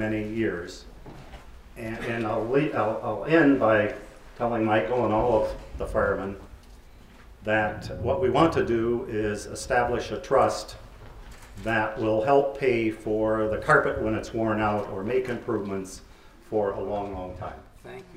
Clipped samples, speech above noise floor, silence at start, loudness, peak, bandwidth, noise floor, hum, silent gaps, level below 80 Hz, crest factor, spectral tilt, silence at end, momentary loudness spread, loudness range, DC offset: under 0.1%; 23 dB; 0 s; -26 LUFS; -6 dBFS; 15 kHz; -49 dBFS; none; none; -46 dBFS; 20 dB; -6 dB/octave; 0 s; 18 LU; 5 LU; under 0.1%